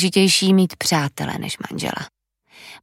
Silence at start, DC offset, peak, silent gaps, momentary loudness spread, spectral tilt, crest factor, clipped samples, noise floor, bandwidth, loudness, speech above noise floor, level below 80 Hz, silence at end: 0 s; under 0.1%; -4 dBFS; none; 13 LU; -4 dB/octave; 16 dB; under 0.1%; -49 dBFS; 16 kHz; -19 LUFS; 30 dB; -58 dBFS; 0.05 s